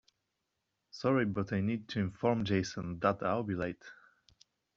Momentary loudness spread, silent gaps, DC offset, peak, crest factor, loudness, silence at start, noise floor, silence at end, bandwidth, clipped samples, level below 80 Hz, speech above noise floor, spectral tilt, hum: 9 LU; none; under 0.1%; -14 dBFS; 22 dB; -34 LUFS; 0.95 s; -84 dBFS; 0.85 s; 7.6 kHz; under 0.1%; -66 dBFS; 52 dB; -6 dB/octave; none